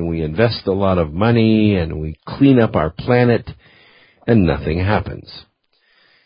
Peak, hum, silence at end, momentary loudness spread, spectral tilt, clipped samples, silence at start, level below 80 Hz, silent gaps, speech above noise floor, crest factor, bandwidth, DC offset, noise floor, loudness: 0 dBFS; none; 0.85 s; 15 LU; -11.5 dB/octave; under 0.1%; 0 s; -34 dBFS; none; 45 dB; 16 dB; 5.4 kHz; under 0.1%; -60 dBFS; -16 LUFS